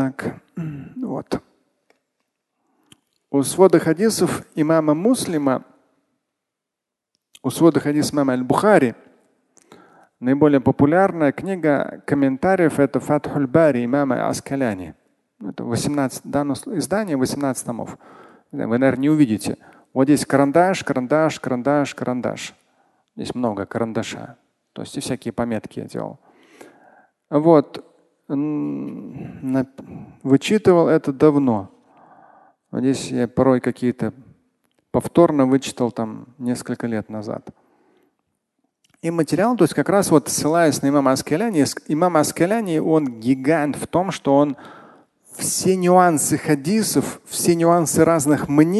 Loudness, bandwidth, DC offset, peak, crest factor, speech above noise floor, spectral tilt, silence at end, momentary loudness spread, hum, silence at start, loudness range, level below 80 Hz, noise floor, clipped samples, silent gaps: -19 LUFS; 12.5 kHz; under 0.1%; 0 dBFS; 20 dB; 65 dB; -5.5 dB/octave; 0 s; 15 LU; none; 0 s; 8 LU; -56 dBFS; -84 dBFS; under 0.1%; none